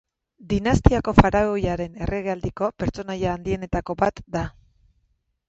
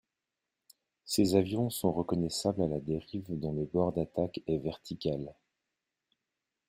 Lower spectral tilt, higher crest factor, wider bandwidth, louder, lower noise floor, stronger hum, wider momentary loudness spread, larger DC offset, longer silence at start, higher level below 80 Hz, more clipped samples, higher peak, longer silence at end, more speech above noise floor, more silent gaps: about the same, -7 dB/octave vs -6 dB/octave; about the same, 24 dB vs 22 dB; second, 8 kHz vs 16 kHz; first, -23 LUFS vs -33 LUFS; second, -69 dBFS vs -88 dBFS; neither; about the same, 11 LU vs 9 LU; neither; second, 0.4 s vs 1.05 s; first, -32 dBFS vs -60 dBFS; neither; first, 0 dBFS vs -12 dBFS; second, 1 s vs 1.35 s; second, 47 dB vs 57 dB; neither